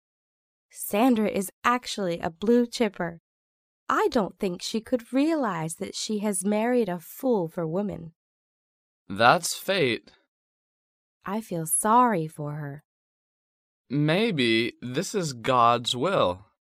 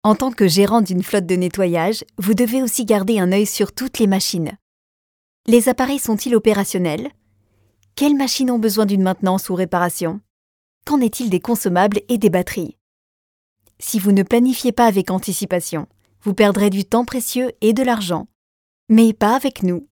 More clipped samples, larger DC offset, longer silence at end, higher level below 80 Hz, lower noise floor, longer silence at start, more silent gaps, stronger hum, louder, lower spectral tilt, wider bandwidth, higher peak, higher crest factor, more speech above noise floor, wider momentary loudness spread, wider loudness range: neither; neither; first, 0.35 s vs 0.15 s; second, -64 dBFS vs -52 dBFS; first, under -90 dBFS vs -60 dBFS; first, 0.75 s vs 0.05 s; first, 1.53-1.62 s, 3.20-3.87 s, 8.16-9.06 s, 10.28-11.21 s, 12.85-13.85 s vs 4.62-5.44 s, 10.30-10.81 s, 12.81-13.56 s, 18.35-18.87 s; neither; second, -25 LUFS vs -17 LUFS; about the same, -4.5 dB/octave vs -5 dB/octave; second, 15.5 kHz vs 19.5 kHz; second, -4 dBFS vs 0 dBFS; first, 24 dB vs 18 dB; first, over 65 dB vs 43 dB; first, 13 LU vs 10 LU; about the same, 3 LU vs 2 LU